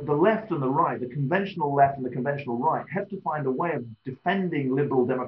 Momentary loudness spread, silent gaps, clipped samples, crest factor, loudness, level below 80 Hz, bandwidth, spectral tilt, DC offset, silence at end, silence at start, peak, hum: 8 LU; none; under 0.1%; 18 dB; -26 LUFS; -68 dBFS; 5.8 kHz; -6.5 dB/octave; under 0.1%; 0 s; 0 s; -8 dBFS; none